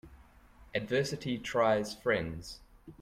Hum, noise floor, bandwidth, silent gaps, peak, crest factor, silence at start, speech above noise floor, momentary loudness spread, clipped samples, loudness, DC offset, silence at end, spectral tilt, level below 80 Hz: none; -58 dBFS; 16 kHz; none; -16 dBFS; 18 dB; 0.05 s; 26 dB; 16 LU; under 0.1%; -32 LUFS; under 0.1%; 0 s; -5 dB/octave; -58 dBFS